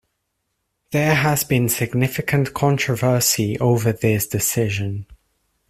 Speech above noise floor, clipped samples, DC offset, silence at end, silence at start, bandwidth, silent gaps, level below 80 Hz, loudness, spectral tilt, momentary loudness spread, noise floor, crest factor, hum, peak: 55 dB; under 0.1%; under 0.1%; 0.55 s; 0.9 s; 16 kHz; none; -50 dBFS; -19 LUFS; -4.5 dB/octave; 5 LU; -74 dBFS; 18 dB; none; -2 dBFS